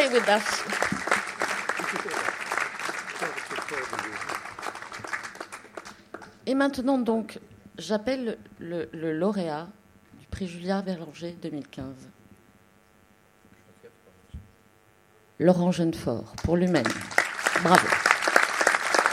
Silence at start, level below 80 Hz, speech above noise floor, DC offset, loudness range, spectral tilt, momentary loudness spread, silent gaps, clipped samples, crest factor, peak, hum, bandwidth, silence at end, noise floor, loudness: 0 s; -56 dBFS; 33 dB; under 0.1%; 13 LU; -4 dB/octave; 19 LU; none; under 0.1%; 28 dB; 0 dBFS; none; 16 kHz; 0 s; -60 dBFS; -26 LUFS